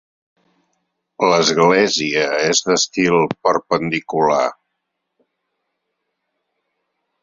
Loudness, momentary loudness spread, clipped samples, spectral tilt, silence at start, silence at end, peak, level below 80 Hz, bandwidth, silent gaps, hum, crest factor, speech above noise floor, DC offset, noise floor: -16 LUFS; 6 LU; under 0.1%; -3 dB/octave; 1.2 s; 2.7 s; -2 dBFS; -60 dBFS; 7.8 kHz; none; none; 18 dB; 60 dB; under 0.1%; -76 dBFS